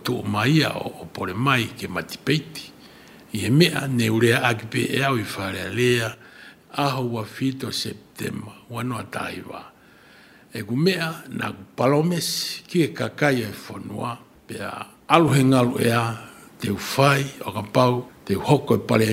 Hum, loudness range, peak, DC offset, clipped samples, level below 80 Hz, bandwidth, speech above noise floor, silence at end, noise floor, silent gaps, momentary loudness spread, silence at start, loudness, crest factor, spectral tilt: none; 7 LU; 0 dBFS; under 0.1%; under 0.1%; -58 dBFS; 16 kHz; 28 dB; 0 s; -51 dBFS; none; 15 LU; 0 s; -22 LUFS; 22 dB; -5.5 dB/octave